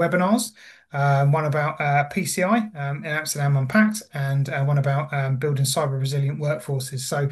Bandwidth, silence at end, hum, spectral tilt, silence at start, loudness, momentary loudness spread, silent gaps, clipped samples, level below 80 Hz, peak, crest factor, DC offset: 12.5 kHz; 0 s; none; -5.5 dB/octave; 0 s; -23 LUFS; 7 LU; none; under 0.1%; -64 dBFS; -4 dBFS; 18 dB; under 0.1%